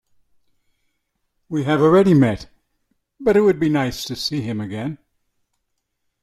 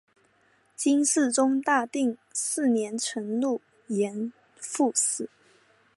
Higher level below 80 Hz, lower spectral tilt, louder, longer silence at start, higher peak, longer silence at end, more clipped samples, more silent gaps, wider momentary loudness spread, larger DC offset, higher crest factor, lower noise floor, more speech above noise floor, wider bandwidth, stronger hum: first, -50 dBFS vs -82 dBFS; first, -6.5 dB/octave vs -3 dB/octave; first, -18 LUFS vs -26 LUFS; first, 1.5 s vs 0.8 s; first, -4 dBFS vs -10 dBFS; first, 1.25 s vs 0.7 s; neither; neither; about the same, 14 LU vs 12 LU; neither; about the same, 16 dB vs 18 dB; first, -74 dBFS vs -65 dBFS; first, 57 dB vs 39 dB; first, 14 kHz vs 11.5 kHz; neither